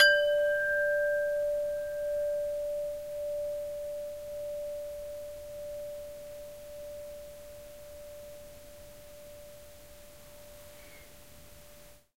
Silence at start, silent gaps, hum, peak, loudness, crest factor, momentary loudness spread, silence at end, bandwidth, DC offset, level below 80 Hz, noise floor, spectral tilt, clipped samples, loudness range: 0 s; none; none; -10 dBFS; -33 LUFS; 24 dB; 24 LU; 0 s; 16 kHz; 0.2%; -60 dBFS; -55 dBFS; -1.5 dB/octave; under 0.1%; 19 LU